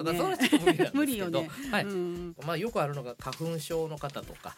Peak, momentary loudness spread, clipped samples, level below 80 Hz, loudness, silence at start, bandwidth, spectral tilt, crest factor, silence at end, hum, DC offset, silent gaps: -10 dBFS; 13 LU; under 0.1%; -58 dBFS; -30 LUFS; 0 s; 17 kHz; -5 dB/octave; 20 dB; 0.05 s; none; under 0.1%; none